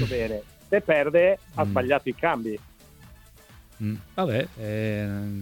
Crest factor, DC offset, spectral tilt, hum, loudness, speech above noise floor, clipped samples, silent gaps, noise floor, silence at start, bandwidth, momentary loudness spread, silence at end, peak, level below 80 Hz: 18 dB; under 0.1%; -7 dB/octave; none; -26 LUFS; 26 dB; under 0.1%; none; -51 dBFS; 0 s; 18.5 kHz; 12 LU; 0 s; -8 dBFS; -50 dBFS